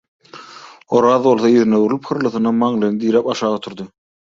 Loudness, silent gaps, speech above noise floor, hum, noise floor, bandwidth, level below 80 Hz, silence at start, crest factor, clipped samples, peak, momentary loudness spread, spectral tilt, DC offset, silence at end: -16 LUFS; none; 24 dB; none; -39 dBFS; 7.6 kHz; -60 dBFS; 0.35 s; 16 dB; under 0.1%; -2 dBFS; 19 LU; -6.5 dB/octave; under 0.1%; 0.45 s